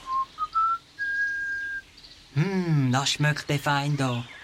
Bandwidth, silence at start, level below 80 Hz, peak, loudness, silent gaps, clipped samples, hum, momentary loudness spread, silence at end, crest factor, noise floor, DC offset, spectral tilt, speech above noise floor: 15.5 kHz; 0 s; -58 dBFS; -10 dBFS; -26 LUFS; none; under 0.1%; none; 7 LU; 0 s; 16 dB; -50 dBFS; under 0.1%; -5 dB/octave; 25 dB